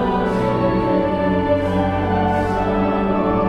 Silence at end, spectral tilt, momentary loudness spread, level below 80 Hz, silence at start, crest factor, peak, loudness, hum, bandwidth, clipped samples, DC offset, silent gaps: 0 s; -8.5 dB/octave; 1 LU; -34 dBFS; 0 s; 12 dB; -6 dBFS; -19 LUFS; none; 9.8 kHz; under 0.1%; 0.4%; none